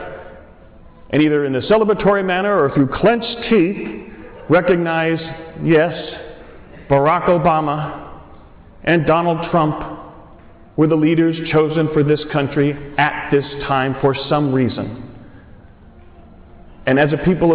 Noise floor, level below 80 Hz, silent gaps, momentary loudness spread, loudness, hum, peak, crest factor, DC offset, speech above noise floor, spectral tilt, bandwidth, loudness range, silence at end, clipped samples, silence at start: -42 dBFS; -42 dBFS; none; 15 LU; -17 LUFS; none; -6 dBFS; 12 dB; under 0.1%; 26 dB; -11 dB/octave; 4 kHz; 4 LU; 0 s; under 0.1%; 0 s